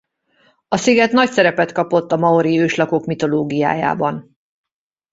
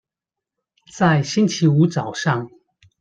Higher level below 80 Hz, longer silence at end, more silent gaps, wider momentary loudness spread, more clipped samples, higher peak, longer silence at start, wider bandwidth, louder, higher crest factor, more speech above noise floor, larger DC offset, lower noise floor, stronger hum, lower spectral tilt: about the same, -58 dBFS vs -60 dBFS; first, 0.9 s vs 0.55 s; neither; about the same, 6 LU vs 7 LU; neither; about the same, -2 dBFS vs -4 dBFS; second, 0.7 s vs 0.95 s; second, 8 kHz vs 9 kHz; first, -16 LUFS vs -19 LUFS; about the same, 16 dB vs 16 dB; second, 43 dB vs 69 dB; neither; second, -58 dBFS vs -87 dBFS; neither; about the same, -5.5 dB/octave vs -6 dB/octave